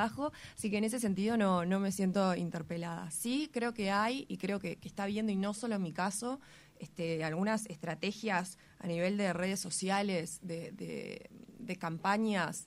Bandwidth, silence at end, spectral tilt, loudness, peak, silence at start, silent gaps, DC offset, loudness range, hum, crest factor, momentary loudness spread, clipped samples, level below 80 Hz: 15 kHz; 0 s; -5 dB/octave; -35 LUFS; -18 dBFS; 0 s; none; under 0.1%; 3 LU; none; 18 dB; 11 LU; under 0.1%; -70 dBFS